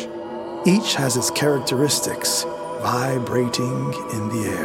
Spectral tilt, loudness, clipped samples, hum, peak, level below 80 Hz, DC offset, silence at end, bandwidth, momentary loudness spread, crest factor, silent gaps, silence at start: -4 dB/octave; -21 LUFS; under 0.1%; none; -4 dBFS; -58 dBFS; under 0.1%; 0 s; 17 kHz; 8 LU; 18 dB; none; 0 s